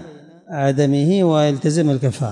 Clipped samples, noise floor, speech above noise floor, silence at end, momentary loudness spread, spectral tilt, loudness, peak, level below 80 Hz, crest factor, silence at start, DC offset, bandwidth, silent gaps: under 0.1%; -40 dBFS; 24 dB; 0 s; 5 LU; -7 dB/octave; -17 LUFS; -6 dBFS; -64 dBFS; 12 dB; 0 s; under 0.1%; 11 kHz; none